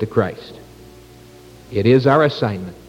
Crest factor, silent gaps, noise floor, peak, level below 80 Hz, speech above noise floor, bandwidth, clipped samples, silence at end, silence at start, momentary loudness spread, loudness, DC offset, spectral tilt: 18 dB; none; -43 dBFS; -2 dBFS; -50 dBFS; 26 dB; 16 kHz; under 0.1%; 0.15 s; 0 s; 18 LU; -17 LUFS; under 0.1%; -8 dB/octave